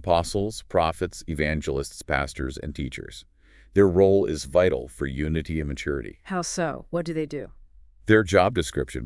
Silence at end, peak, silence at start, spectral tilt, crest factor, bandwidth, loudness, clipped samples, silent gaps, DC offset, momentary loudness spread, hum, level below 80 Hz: 0 s; -4 dBFS; 0 s; -5.5 dB/octave; 22 dB; 12 kHz; -25 LUFS; under 0.1%; none; under 0.1%; 14 LU; none; -42 dBFS